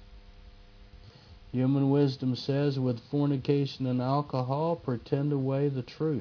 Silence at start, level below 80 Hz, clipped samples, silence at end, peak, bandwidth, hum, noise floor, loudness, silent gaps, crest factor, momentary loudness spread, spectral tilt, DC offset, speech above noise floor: 0 s; -58 dBFS; under 0.1%; 0 s; -12 dBFS; 5.4 kHz; none; -52 dBFS; -29 LUFS; none; 16 dB; 6 LU; -9 dB/octave; under 0.1%; 24 dB